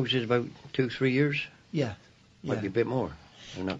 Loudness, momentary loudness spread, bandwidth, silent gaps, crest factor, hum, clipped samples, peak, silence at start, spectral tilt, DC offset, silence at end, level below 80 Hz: -30 LUFS; 15 LU; 7.8 kHz; none; 18 dB; none; under 0.1%; -12 dBFS; 0 s; -6.5 dB/octave; under 0.1%; 0 s; -62 dBFS